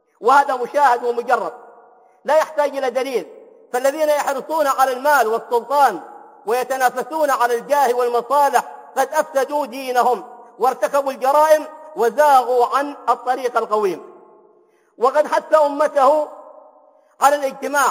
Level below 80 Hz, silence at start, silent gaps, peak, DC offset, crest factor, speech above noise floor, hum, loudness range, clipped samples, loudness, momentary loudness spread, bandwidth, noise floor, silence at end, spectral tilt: -76 dBFS; 0.2 s; none; 0 dBFS; under 0.1%; 18 dB; 38 dB; none; 3 LU; under 0.1%; -18 LUFS; 8 LU; 16 kHz; -55 dBFS; 0 s; -2.5 dB/octave